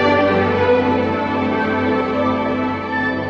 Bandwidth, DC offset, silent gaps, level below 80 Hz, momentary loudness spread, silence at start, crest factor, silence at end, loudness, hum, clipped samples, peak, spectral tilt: 7 kHz; under 0.1%; none; -40 dBFS; 5 LU; 0 s; 14 dB; 0 s; -17 LUFS; none; under 0.1%; -4 dBFS; -7.5 dB/octave